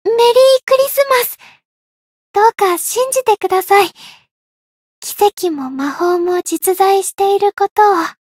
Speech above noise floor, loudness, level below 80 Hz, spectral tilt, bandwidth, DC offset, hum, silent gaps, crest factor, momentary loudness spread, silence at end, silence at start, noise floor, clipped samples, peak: over 76 dB; -13 LUFS; -64 dBFS; -1.5 dB/octave; 16.5 kHz; under 0.1%; none; 0.63-0.67 s, 1.65-2.34 s, 4.31-5.02 s, 7.71-7.76 s; 14 dB; 10 LU; 0.15 s; 0.05 s; under -90 dBFS; under 0.1%; 0 dBFS